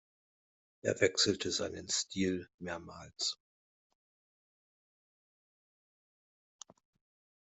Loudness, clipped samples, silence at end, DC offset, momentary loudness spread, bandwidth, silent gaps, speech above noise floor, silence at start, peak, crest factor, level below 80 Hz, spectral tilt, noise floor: -34 LUFS; under 0.1%; 4.1 s; under 0.1%; 14 LU; 8.2 kHz; 2.54-2.58 s; over 55 dB; 0.85 s; -14 dBFS; 26 dB; -74 dBFS; -2.5 dB/octave; under -90 dBFS